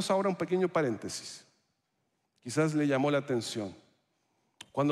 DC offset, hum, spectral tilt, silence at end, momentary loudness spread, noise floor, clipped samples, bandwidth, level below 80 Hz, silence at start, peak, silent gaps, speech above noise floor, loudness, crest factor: under 0.1%; none; -5.5 dB/octave; 0 s; 14 LU; -79 dBFS; under 0.1%; 13.5 kHz; -76 dBFS; 0 s; -14 dBFS; none; 49 dB; -31 LUFS; 18 dB